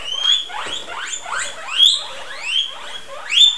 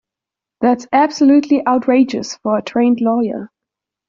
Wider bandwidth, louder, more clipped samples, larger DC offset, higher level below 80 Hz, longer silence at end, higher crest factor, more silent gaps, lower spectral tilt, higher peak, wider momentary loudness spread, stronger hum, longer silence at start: first, 11 kHz vs 7.4 kHz; about the same, -17 LUFS vs -15 LUFS; neither; first, 2% vs under 0.1%; about the same, -58 dBFS vs -60 dBFS; second, 0 s vs 0.65 s; first, 18 dB vs 12 dB; neither; second, 2.5 dB/octave vs -4.5 dB/octave; about the same, -2 dBFS vs -2 dBFS; first, 17 LU vs 8 LU; neither; second, 0 s vs 0.6 s